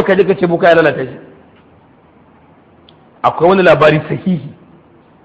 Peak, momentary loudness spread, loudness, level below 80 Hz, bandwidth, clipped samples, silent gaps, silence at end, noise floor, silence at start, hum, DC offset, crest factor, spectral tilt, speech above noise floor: 0 dBFS; 13 LU; -11 LUFS; -48 dBFS; 8.2 kHz; 0.1%; none; 0.75 s; -46 dBFS; 0 s; none; under 0.1%; 14 dB; -8 dB/octave; 35 dB